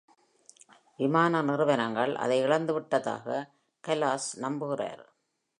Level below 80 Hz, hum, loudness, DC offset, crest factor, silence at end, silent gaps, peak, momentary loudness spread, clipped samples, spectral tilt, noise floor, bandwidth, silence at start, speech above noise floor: -82 dBFS; none; -29 LUFS; under 0.1%; 20 dB; 0.55 s; none; -10 dBFS; 10 LU; under 0.1%; -5 dB/octave; -60 dBFS; 11 kHz; 1 s; 32 dB